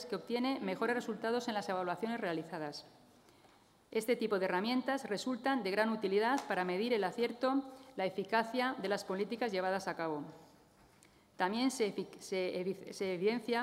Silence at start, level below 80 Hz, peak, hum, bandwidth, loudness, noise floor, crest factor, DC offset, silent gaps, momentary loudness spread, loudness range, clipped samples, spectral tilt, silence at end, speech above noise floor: 0 s; -80 dBFS; -18 dBFS; none; 16 kHz; -36 LUFS; -65 dBFS; 18 dB; under 0.1%; none; 7 LU; 5 LU; under 0.1%; -4.5 dB/octave; 0 s; 30 dB